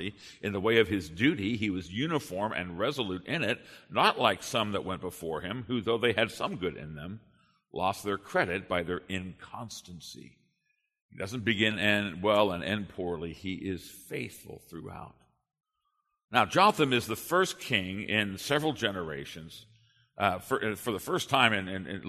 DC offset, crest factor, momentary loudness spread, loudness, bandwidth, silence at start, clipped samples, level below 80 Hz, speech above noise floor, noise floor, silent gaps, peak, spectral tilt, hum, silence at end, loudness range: under 0.1%; 24 dB; 18 LU; -30 LUFS; 13.5 kHz; 0 s; under 0.1%; -62 dBFS; 49 dB; -79 dBFS; 11.02-11.09 s, 16.24-16.28 s; -6 dBFS; -4.5 dB/octave; none; 0 s; 7 LU